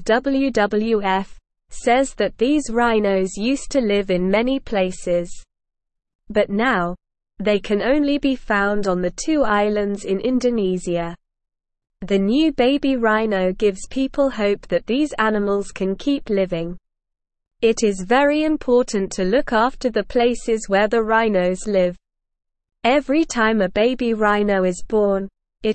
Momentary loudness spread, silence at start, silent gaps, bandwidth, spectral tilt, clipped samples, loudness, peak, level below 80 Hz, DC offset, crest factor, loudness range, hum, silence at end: 6 LU; 0 s; 6.15-6.19 s; 8.8 kHz; -5 dB/octave; under 0.1%; -19 LUFS; -2 dBFS; -42 dBFS; 0.4%; 16 dB; 3 LU; none; 0 s